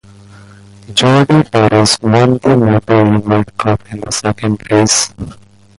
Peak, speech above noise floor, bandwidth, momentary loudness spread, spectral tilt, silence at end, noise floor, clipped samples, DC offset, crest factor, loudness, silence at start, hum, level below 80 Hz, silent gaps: 0 dBFS; 27 dB; 11.5 kHz; 9 LU; -5 dB/octave; 0.45 s; -38 dBFS; under 0.1%; under 0.1%; 12 dB; -11 LUFS; 0.9 s; none; -40 dBFS; none